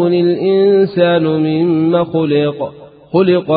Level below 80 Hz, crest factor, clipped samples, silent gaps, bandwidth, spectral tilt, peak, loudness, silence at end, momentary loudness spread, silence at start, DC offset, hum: -54 dBFS; 12 dB; under 0.1%; none; 4.9 kHz; -13 dB/octave; 0 dBFS; -13 LUFS; 0 s; 7 LU; 0 s; under 0.1%; none